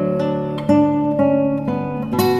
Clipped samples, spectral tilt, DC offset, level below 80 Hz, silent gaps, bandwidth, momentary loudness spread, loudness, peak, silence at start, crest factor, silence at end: under 0.1%; -7.5 dB/octave; under 0.1%; -48 dBFS; none; 15.5 kHz; 7 LU; -18 LUFS; -2 dBFS; 0 s; 14 dB; 0 s